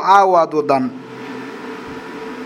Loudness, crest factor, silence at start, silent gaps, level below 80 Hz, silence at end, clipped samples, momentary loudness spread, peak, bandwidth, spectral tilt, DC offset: -15 LUFS; 18 dB; 0 s; none; -60 dBFS; 0 s; under 0.1%; 19 LU; 0 dBFS; 14 kHz; -5.5 dB/octave; under 0.1%